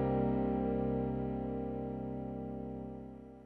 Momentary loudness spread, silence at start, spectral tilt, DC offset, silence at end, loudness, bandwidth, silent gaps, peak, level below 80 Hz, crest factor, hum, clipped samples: 12 LU; 0 s; -11.5 dB/octave; under 0.1%; 0 s; -37 LUFS; 4.3 kHz; none; -22 dBFS; -50 dBFS; 14 dB; none; under 0.1%